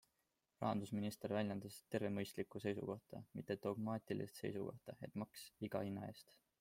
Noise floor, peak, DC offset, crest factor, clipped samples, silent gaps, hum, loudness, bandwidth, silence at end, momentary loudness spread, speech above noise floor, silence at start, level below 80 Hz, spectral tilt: -87 dBFS; -26 dBFS; under 0.1%; 20 dB; under 0.1%; none; none; -46 LUFS; 16.5 kHz; 0.4 s; 9 LU; 41 dB; 0.6 s; -80 dBFS; -6.5 dB/octave